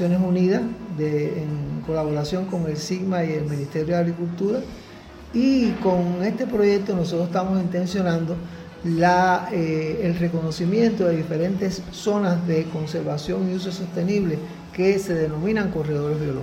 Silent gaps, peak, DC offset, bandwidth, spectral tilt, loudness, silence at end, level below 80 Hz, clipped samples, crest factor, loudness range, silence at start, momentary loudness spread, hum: none; -6 dBFS; under 0.1%; 14 kHz; -7 dB/octave; -23 LUFS; 0 s; -48 dBFS; under 0.1%; 16 dB; 3 LU; 0 s; 8 LU; none